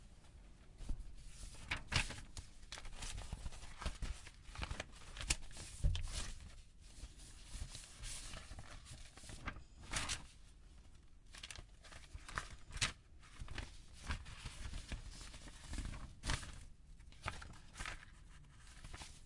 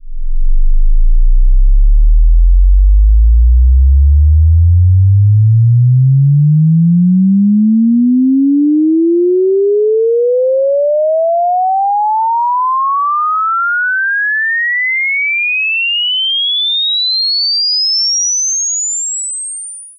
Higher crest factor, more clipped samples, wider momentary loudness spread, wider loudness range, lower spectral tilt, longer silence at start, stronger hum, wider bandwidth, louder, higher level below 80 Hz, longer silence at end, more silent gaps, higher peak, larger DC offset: first, 28 dB vs 6 dB; neither; first, 20 LU vs 6 LU; about the same, 4 LU vs 3 LU; second, -2.5 dB/octave vs -4.5 dB/octave; about the same, 0 s vs 0.05 s; neither; first, 11.5 kHz vs 7 kHz; second, -48 LUFS vs -11 LUFS; second, -50 dBFS vs -12 dBFS; about the same, 0 s vs 0.1 s; neither; second, -18 dBFS vs -2 dBFS; neither